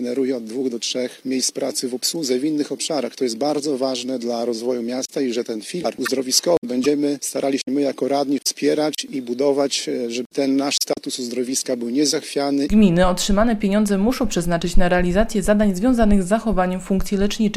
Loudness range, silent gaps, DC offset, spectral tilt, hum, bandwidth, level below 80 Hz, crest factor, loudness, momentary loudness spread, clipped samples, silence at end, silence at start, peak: 4 LU; 6.58-6.62 s, 10.26-10.30 s; under 0.1%; -4.5 dB/octave; none; 15 kHz; -32 dBFS; 18 dB; -20 LUFS; 7 LU; under 0.1%; 0 s; 0 s; 0 dBFS